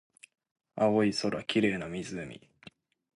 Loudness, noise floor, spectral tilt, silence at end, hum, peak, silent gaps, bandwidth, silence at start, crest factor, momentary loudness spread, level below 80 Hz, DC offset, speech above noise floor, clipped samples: -30 LUFS; -57 dBFS; -5.5 dB/octave; 0.8 s; none; -14 dBFS; none; 11.5 kHz; 0.75 s; 18 dB; 19 LU; -64 dBFS; under 0.1%; 27 dB; under 0.1%